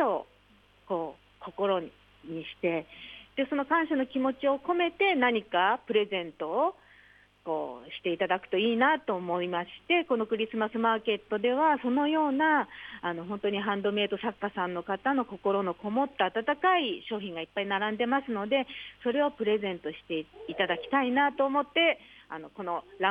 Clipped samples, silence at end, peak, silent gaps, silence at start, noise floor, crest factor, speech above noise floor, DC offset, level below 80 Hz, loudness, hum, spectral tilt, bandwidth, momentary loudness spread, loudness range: under 0.1%; 0 s; -12 dBFS; none; 0 s; -62 dBFS; 18 dB; 33 dB; under 0.1%; -68 dBFS; -29 LUFS; none; -7 dB/octave; 5 kHz; 11 LU; 3 LU